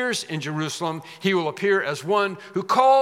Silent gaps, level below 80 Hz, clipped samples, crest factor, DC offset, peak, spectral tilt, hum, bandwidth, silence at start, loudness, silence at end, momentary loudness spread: none; -80 dBFS; under 0.1%; 18 dB; under 0.1%; -4 dBFS; -4.5 dB/octave; none; 15.5 kHz; 0 s; -23 LUFS; 0 s; 8 LU